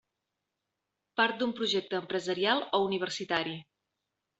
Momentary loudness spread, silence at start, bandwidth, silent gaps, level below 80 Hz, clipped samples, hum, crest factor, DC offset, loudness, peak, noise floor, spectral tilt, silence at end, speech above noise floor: 7 LU; 1.15 s; 8.2 kHz; none; -76 dBFS; under 0.1%; none; 22 dB; under 0.1%; -30 LUFS; -10 dBFS; -86 dBFS; -4 dB/octave; 0.75 s; 55 dB